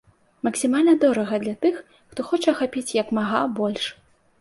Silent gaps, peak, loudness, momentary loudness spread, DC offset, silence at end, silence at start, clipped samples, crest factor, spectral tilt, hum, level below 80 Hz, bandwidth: none; -6 dBFS; -22 LUFS; 12 LU; under 0.1%; 0.5 s; 0.45 s; under 0.1%; 16 dB; -4.5 dB/octave; none; -64 dBFS; 11.5 kHz